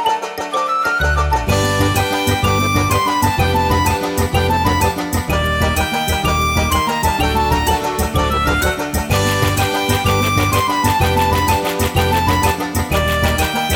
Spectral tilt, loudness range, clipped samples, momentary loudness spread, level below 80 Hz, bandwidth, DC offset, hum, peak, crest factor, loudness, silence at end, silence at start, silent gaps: -4.5 dB/octave; 1 LU; under 0.1%; 3 LU; -26 dBFS; over 20 kHz; under 0.1%; none; 0 dBFS; 16 dB; -16 LUFS; 0 s; 0 s; none